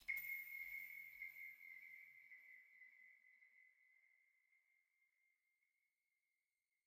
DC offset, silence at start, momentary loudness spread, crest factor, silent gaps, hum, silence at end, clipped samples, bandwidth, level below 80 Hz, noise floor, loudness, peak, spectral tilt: under 0.1%; 0 s; 20 LU; 24 dB; none; none; 2.3 s; under 0.1%; 16 kHz; under -90 dBFS; under -90 dBFS; -53 LUFS; -34 dBFS; 0.5 dB/octave